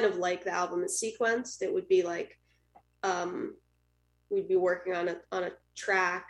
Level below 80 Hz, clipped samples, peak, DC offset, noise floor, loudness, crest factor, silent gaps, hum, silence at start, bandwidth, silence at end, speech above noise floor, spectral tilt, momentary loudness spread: -72 dBFS; under 0.1%; -14 dBFS; under 0.1%; -72 dBFS; -31 LUFS; 18 dB; none; 60 Hz at -65 dBFS; 0 s; 12.5 kHz; 0 s; 41 dB; -3 dB/octave; 10 LU